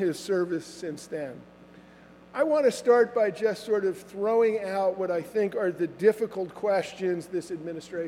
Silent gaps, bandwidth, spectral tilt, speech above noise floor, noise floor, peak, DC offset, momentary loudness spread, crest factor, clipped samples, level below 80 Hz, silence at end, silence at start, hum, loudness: none; 15 kHz; -5.5 dB/octave; 25 dB; -52 dBFS; -8 dBFS; under 0.1%; 13 LU; 18 dB; under 0.1%; -70 dBFS; 0 s; 0 s; none; -27 LUFS